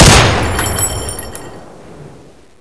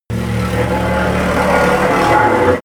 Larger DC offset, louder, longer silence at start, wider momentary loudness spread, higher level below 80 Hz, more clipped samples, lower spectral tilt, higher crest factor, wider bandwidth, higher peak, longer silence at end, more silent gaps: neither; about the same, -12 LUFS vs -14 LUFS; about the same, 0 s vs 0.1 s; first, 23 LU vs 6 LU; first, -22 dBFS vs -30 dBFS; first, 0.5% vs under 0.1%; second, -3.5 dB/octave vs -6 dB/octave; about the same, 14 dB vs 12 dB; second, 11 kHz vs over 20 kHz; about the same, 0 dBFS vs 0 dBFS; first, 0.35 s vs 0.05 s; neither